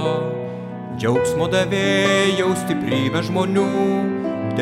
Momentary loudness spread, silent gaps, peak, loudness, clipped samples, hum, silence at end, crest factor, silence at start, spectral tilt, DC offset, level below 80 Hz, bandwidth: 9 LU; none; -6 dBFS; -20 LUFS; under 0.1%; none; 0 s; 14 dB; 0 s; -5.5 dB/octave; under 0.1%; -52 dBFS; 15.5 kHz